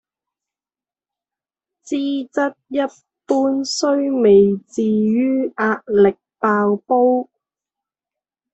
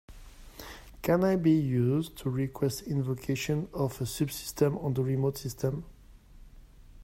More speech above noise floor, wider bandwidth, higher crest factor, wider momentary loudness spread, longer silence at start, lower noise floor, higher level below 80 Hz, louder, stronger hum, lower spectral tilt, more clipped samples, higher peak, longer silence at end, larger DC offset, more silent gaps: first, over 73 dB vs 24 dB; second, 8.2 kHz vs 16 kHz; about the same, 16 dB vs 18 dB; second, 10 LU vs 13 LU; first, 1.85 s vs 0.1 s; first, under -90 dBFS vs -53 dBFS; second, -60 dBFS vs -52 dBFS; first, -18 LUFS vs -30 LUFS; neither; about the same, -5.5 dB/octave vs -6.5 dB/octave; neither; first, -2 dBFS vs -14 dBFS; first, 1.3 s vs 0 s; neither; neither